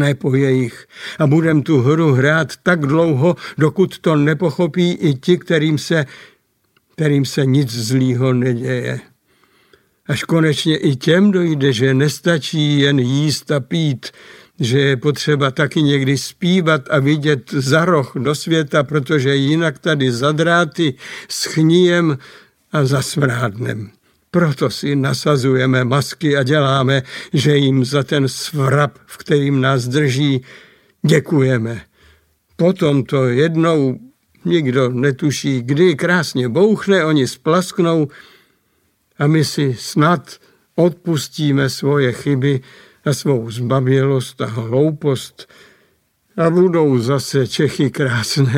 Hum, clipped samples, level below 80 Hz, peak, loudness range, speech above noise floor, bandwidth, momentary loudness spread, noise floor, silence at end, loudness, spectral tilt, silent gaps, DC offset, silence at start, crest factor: none; under 0.1%; -58 dBFS; 0 dBFS; 3 LU; 47 dB; 16 kHz; 7 LU; -62 dBFS; 0 s; -16 LUFS; -6 dB/octave; none; under 0.1%; 0 s; 16 dB